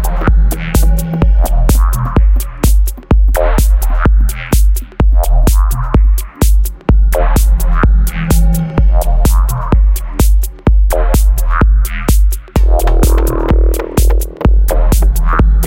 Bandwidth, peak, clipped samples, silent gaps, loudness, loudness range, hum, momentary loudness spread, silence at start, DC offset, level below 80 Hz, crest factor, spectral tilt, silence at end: 17 kHz; 0 dBFS; under 0.1%; none; -13 LUFS; 1 LU; none; 2 LU; 0 s; under 0.1%; -10 dBFS; 8 dB; -6 dB/octave; 0 s